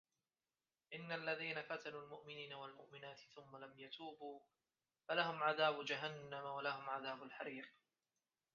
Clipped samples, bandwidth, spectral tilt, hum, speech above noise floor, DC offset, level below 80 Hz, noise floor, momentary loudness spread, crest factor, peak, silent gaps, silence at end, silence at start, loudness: under 0.1%; 7 kHz; -1.5 dB/octave; none; over 44 dB; under 0.1%; under -90 dBFS; under -90 dBFS; 18 LU; 24 dB; -24 dBFS; none; 0.85 s; 0.9 s; -45 LUFS